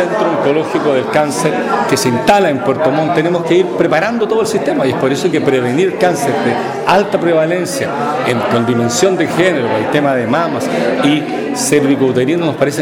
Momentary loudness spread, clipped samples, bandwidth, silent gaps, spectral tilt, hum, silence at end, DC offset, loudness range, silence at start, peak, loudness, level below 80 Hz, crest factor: 3 LU; under 0.1%; 17.5 kHz; none; -5 dB/octave; none; 0 s; under 0.1%; 1 LU; 0 s; 0 dBFS; -13 LUFS; -52 dBFS; 12 dB